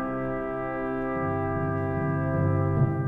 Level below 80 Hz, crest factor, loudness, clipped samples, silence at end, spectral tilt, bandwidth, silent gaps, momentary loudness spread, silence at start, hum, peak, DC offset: -46 dBFS; 14 dB; -28 LUFS; under 0.1%; 0 s; -11 dB/octave; 3.8 kHz; none; 5 LU; 0 s; none; -12 dBFS; under 0.1%